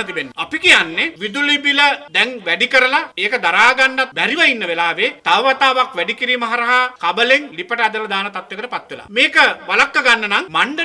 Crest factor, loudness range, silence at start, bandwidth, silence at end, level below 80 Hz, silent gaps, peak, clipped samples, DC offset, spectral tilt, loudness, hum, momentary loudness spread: 16 dB; 3 LU; 0 s; 11 kHz; 0 s; -58 dBFS; none; 0 dBFS; under 0.1%; under 0.1%; -2 dB/octave; -14 LUFS; none; 10 LU